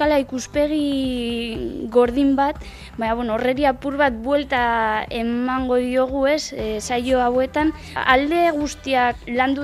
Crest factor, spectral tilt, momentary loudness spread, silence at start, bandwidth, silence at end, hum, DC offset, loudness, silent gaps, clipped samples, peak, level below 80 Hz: 20 dB; -4.5 dB/octave; 7 LU; 0 s; 13.5 kHz; 0 s; none; under 0.1%; -20 LUFS; none; under 0.1%; 0 dBFS; -40 dBFS